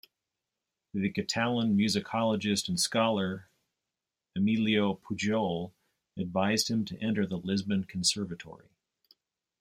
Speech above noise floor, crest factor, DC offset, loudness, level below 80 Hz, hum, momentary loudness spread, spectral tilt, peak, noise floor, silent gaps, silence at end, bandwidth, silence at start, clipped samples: 59 dB; 18 dB; under 0.1%; -30 LUFS; -68 dBFS; none; 12 LU; -4.5 dB/octave; -14 dBFS; -89 dBFS; none; 1.05 s; 16 kHz; 0.95 s; under 0.1%